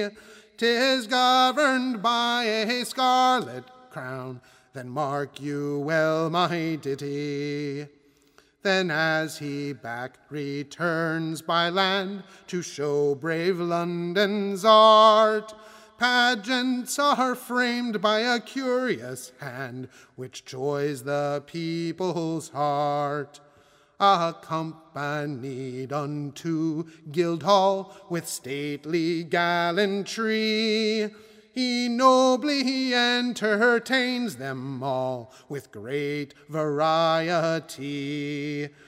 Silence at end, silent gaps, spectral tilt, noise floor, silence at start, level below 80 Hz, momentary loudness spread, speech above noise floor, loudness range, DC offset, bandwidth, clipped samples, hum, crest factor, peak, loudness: 0.2 s; none; -4.5 dB/octave; -60 dBFS; 0 s; -74 dBFS; 14 LU; 35 dB; 8 LU; under 0.1%; 16 kHz; under 0.1%; none; 22 dB; -4 dBFS; -24 LUFS